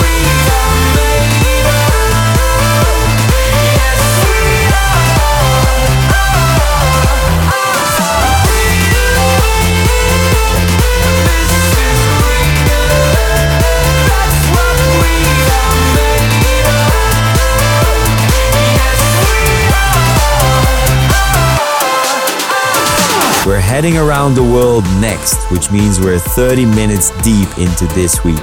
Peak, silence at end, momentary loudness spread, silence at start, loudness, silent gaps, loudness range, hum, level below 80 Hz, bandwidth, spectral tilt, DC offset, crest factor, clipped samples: 0 dBFS; 0 s; 2 LU; 0 s; -10 LUFS; none; 1 LU; none; -16 dBFS; 19.5 kHz; -4 dB/octave; under 0.1%; 10 dB; under 0.1%